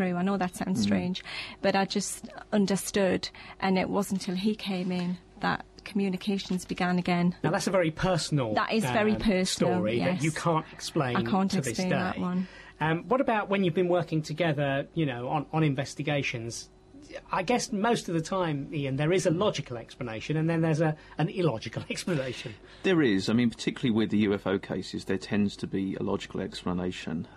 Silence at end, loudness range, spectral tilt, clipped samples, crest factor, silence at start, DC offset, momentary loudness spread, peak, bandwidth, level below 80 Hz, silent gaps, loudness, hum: 0 s; 3 LU; -5.5 dB/octave; under 0.1%; 16 dB; 0 s; under 0.1%; 9 LU; -14 dBFS; 13.5 kHz; -56 dBFS; none; -29 LUFS; none